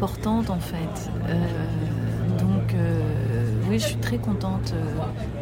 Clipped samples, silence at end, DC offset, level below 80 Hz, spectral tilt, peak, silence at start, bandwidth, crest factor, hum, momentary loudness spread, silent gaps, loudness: under 0.1%; 0 s; under 0.1%; -38 dBFS; -7 dB/octave; -12 dBFS; 0 s; 16.5 kHz; 12 dB; none; 6 LU; none; -25 LUFS